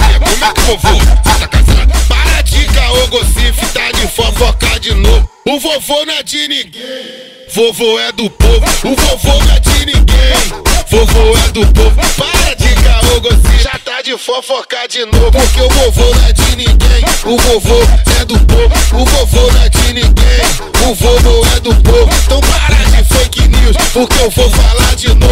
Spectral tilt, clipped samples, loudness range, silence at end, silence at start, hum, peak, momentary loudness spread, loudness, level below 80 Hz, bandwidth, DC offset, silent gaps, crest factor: -4 dB/octave; 1%; 3 LU; 0 s; 0 s; none; 0 dBFS; 5 LU; -9 LUFS; -8 dBFS; 16.5 kHz; 1%; none; 8 dB